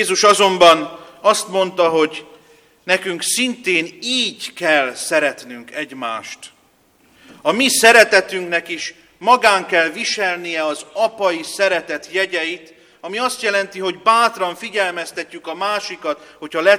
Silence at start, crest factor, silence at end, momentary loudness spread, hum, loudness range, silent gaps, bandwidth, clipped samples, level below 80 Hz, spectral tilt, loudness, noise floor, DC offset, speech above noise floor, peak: 0 s; 18 dB; 0 s; 16 LU; none; 6 LU; none; 17 kHz; under 0.1%; -64 dBFS; -1.5 dB/octave; -16 LUFS; -56 dBFS; under 0.1%; 39 dB; 0 dBFS